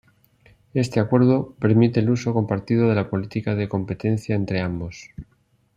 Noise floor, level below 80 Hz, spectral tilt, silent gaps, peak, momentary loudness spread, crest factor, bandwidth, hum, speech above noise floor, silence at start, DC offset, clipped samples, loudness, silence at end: -56 dBFS; -54 dBFS; -8 dB/octave; none; -4 dBFS; 11 LU; 18 dB; 9.8 kHz; none; 35 dB; 0.75 s; under 0.1%; under 0.1%; -22 LUFS; 0.55 s